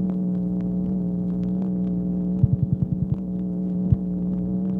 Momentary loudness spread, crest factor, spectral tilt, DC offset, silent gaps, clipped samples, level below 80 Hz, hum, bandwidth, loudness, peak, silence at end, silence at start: 4 LU; 18 dB; -13 dB/octave; under 0.1%; none; under 0.1%; -40 dBFS; 60 Hz at -35 dBFS; 1.6 kHz; -24 LUFS; -4 dBFS; 0 s; 0 s